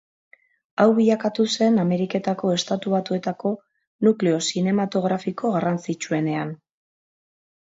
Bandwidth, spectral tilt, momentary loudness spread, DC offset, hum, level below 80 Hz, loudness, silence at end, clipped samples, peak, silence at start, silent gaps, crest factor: 7.8 kHz; -5.5 dB/octave; 9 LU; under 0.1%; none; -68 dBFS; -22 LUFS; 1.1 s; under 0.1%; -6 dBFS; 0.8 s; 3.87-3.99 s; 18 dB